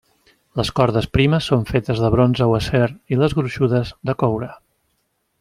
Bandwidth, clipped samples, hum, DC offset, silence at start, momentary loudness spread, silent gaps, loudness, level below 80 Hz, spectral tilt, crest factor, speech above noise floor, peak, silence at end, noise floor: 12 kHz; under 0.1%; none; under 0.1%; 0.55 s; 8 LU; none; -19 LUFS; -40 dBFS; -7 dB/octave; 18 dB; 51 dB; -2 dBFS; 0.85 s; -69 dBFS